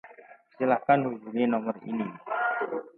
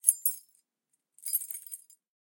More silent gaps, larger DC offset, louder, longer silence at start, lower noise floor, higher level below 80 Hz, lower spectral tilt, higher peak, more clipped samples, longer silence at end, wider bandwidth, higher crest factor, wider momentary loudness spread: neither; neither; first, -28 LUFS vs -31 LUFS; about the same, 0.05 s vs 0.05 s; second, -53 dBFS vs -81 dBFS; first, -80 dBFS vs under -90 dBFS; first, -10 dB/octave vs 6.5 dB/octave; second, -8 dBFS vs -2 dBFS; neither; second, 0.1 s vs 0.5 s; second, 4.2 kHz vs 17.5 kHz; second, 20 dB vs 32 dB; second, 9 LU vs 16 LU